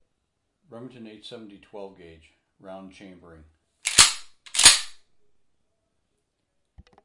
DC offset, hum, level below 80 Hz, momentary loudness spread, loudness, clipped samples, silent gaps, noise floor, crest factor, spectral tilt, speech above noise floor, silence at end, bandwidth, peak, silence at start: under 0.1%; none; -56 dBFS; 29 LU; -17 LUFS; under 0.1%; none; -76 dBFS; 28 dB; 1 dB/octave; 33 dB; 2.15 s; 12 kHz; 0 dBFS; 0.75 s